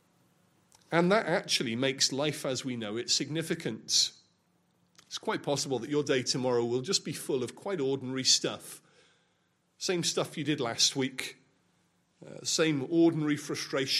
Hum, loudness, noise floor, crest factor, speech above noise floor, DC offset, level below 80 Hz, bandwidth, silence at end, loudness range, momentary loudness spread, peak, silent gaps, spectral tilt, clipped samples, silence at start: none; -29 LUFS; -73 dBFS; 22 dB; 43 dB; under 0.1%; -78 dBFS; 14.5 kHz; 0 s; 3 LU; 10 LU; -10 dBFS; none; -3 dB/octave; under 0.1%; 0.9 s